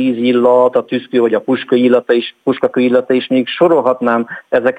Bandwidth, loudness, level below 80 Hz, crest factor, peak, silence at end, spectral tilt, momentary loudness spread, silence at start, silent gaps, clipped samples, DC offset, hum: 8.8 kHz; -13 LUFS; -60 dBFS; 12 dB; 0 dBFS; 0 s; -7 dB/octave; 6 LU; 0 s; none; under 0.1%; under 0.1%; none